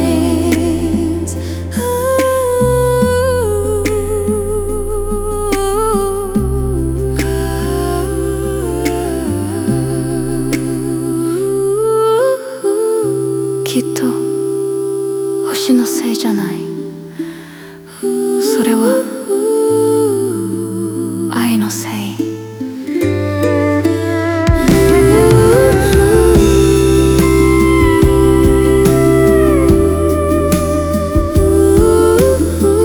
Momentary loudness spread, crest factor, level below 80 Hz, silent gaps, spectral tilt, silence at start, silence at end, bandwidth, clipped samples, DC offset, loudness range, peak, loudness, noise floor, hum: 10 LU; 12 dB; -24 dBFS; none; -6 dB/octave; 0 s; 0 s; over 20 kHz; under 0.1%; under 0.1%; 7 LU; 0 dBFS; -13 LUFS; -33 dBFS; none